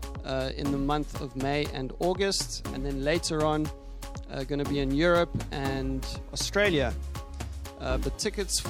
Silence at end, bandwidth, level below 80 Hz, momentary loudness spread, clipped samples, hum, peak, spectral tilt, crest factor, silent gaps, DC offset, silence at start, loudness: 0 s; 17 kHz; -38 dBFS; 13 LU; under 0.1%; none; -12 dBFS; -4.5 dB/octave; 18 dB; none; under 0.1%; 0 s; -29 LUFS